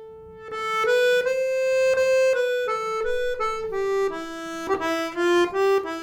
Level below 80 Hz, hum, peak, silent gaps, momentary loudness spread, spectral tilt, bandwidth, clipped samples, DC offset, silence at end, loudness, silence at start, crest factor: -52 dBFS; none; -10 dBFS; none; 11 LU; -3 dB/octave; 17 kHz; under 0.1%; under 0.1%; 0 s; -23 LUFS; 0 s; 12 dB